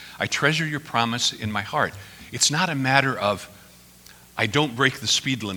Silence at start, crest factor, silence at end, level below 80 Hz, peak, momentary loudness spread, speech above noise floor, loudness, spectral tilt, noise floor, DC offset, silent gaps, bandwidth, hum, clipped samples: 0 s; 24 dB; 0 s; -58 dBFS; 0 dBFS; 10 LU; 26 dB; -22 LUFS; -3 dB/octave; -49 dBFS; under 0.1%; none; over 20 kHz; none; under 0.1%